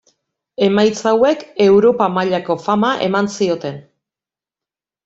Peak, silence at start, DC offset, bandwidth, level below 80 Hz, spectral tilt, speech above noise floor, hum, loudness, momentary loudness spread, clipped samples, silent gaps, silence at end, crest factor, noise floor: -2 dBFS; 0.6 s; under 0.1%; 8 kHz; -56 dBFS; -5.5 dB/octave; 75 dB; none; -15 LUFS; 10 LU; under 0.1%; none; 1.25 s; 16 dB; -90 dBFS